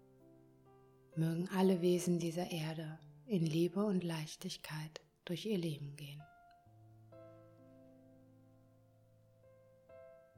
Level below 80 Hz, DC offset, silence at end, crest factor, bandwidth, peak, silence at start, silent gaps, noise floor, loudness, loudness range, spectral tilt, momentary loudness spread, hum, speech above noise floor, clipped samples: -78 dBFS; under 0.1%; 0.2 s; 18 dB; 19 kHz; -22 dBFS; 1.15 s; none; -67 dBFS; -38 LUFS; 11 LU; -6.5 dB/octave; 25 LU; none; 30 dB; under 0.1%